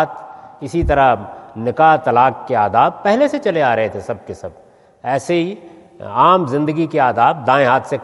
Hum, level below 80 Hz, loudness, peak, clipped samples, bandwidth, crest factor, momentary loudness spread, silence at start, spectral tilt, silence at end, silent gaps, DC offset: none; -38 dBFS; -15 LUFS; 0 dBFS; under 0.1%; 11.5 kHz; 16 dB; 18 LU; 0 s; -6.5 dB/octave; 0 s; none; under 0.1%